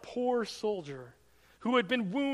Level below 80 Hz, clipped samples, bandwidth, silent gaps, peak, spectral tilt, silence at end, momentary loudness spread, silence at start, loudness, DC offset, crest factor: -72 dBFS; under 0.1%; 12.5 kHz; none; -16 dBFS; -5 dB/octave; 0 s; 13 LU; 0 s; -32 LUFS; under 0.1%; 18 dB